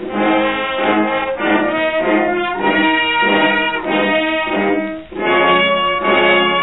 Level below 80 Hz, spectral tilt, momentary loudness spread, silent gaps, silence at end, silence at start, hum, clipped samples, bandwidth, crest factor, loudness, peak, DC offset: -48 dBFS; -8 dB/octave; 5 LU; none; 0 s; 0 s; none; under 0.1%; 4.1 kHz; 12 dB; -14 LUFS; -2 dBFS; 0.6%